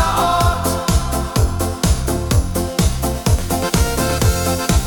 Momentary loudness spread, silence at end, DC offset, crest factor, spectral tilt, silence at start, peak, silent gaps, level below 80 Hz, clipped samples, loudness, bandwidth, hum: 4 LU; 0 s; under 0.1%; 14 dB; -5 dB/octave; 0 s; -2 dBFS; none; -22 dBFS; under 0.1%; -18 LUFS; 19 kHz; none